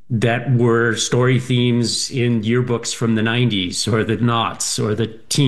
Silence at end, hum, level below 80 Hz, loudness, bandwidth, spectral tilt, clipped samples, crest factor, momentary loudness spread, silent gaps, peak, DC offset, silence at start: 0 s; none; -54 dBFS; -18 LUFS; 12.5 kHz; -5 dB/octave; under 0.1%; 14 dB; 4 LU; none; -4 dBFS; 0.9%; 0.1 s